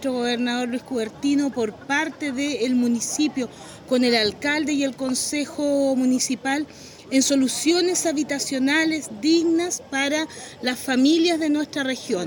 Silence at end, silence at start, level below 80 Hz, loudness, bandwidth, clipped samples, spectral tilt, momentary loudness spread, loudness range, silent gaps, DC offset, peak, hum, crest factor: 0 s; 0 s; -64 dBFS; -22 LUFS; 17 kHz; under 0.1%; -2.5 dB/octave; 8 LU; 2 LU; none; under 0.1%; -6 dBFS; none; 18 dB